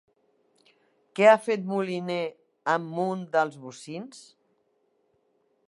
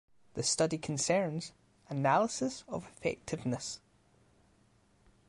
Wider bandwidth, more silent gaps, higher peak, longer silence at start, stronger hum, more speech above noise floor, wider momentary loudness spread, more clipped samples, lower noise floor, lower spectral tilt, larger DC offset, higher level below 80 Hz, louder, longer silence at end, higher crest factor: about the same, 11.5 kHz vs 11.5 kHz; neither; first, -4 dBFS vs -16 dBFS; first, 1.15 s vs 0.35 s; neither; first, 45 dB vs 34 dB; first, 20 LU vs 13 LU; neither; about the same, -71 dBFS vs -68 dBFS; first, -5.5 dB/octave vs -4 dB/octave; neither; second, -84 dBFS vs -66 dBFS; first, -25 LUFS vs -33 LUFS; about the same, 1.45 s vs 1.5 s; about the same, 24 dB vs 20 dB